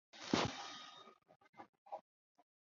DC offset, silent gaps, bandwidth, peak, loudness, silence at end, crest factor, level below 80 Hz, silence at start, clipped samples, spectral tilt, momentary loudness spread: under 0.1%; 1.36-1.40 s, 1.49-1.53 s, 1.69-1.86 s; 7.4 kHz; -20 dBFS; -43 LUFS; 0.8 s; 28 dB; -72 dBFS; 0.15 s; under 0.1%; -3 dB/octave; 23 LU